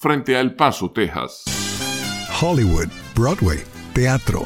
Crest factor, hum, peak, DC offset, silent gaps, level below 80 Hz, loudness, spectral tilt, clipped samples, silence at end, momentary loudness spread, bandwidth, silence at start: 18 dB; none; 0 dBFS; under 0.1%; none; -32 dBFS; -20 LUFS; -5 dB/octave; under 0.1%; 0 s; 6 LU; 17 kHz; 0 s